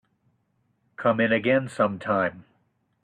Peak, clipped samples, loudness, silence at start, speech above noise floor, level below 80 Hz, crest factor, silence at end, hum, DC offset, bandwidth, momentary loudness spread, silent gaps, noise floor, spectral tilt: -10 dBFS; under 0.1%; -24 LUFS; 1 s; 47 dB; -66 dBFS; 18 dB; 0.6 s; none; under 0.1%; 10.5 kHz; 5 LU; none; -70 dBFS; -6.5 dB/octave